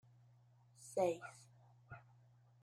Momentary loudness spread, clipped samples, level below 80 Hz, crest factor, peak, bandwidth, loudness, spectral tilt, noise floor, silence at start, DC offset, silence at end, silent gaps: 23 LU; under 0.1%; -84 dBFS; 22 dB; -24 dBFS; 14.5 kHz; -41 LUFS; -5.5 dB/octave; -69 dBFS; 0.8 s; under 0.1%; 0.65 s; none